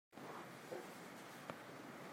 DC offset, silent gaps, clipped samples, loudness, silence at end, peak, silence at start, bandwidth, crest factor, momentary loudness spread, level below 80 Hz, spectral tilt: under 0.1%; none; under 0.1%; -53 LUFS; 0 s; -28 dBFS; 0.1 s; 16 kHz; 26 dB; 3 LU; under -90 dBFS; -4 dB/octave